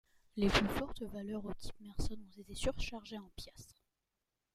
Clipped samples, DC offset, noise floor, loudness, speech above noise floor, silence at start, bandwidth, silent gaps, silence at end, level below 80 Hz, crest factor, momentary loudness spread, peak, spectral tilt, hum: under 0.1%; under 0.1%; -88 dBFS; -39 LUFS; 50 dB; 0.35 s; 15.5 kHz; none; 0.8 s; -48 dBFS; 24 dB; 20 LU; -16 dBFS; -4.5 dB/octave; none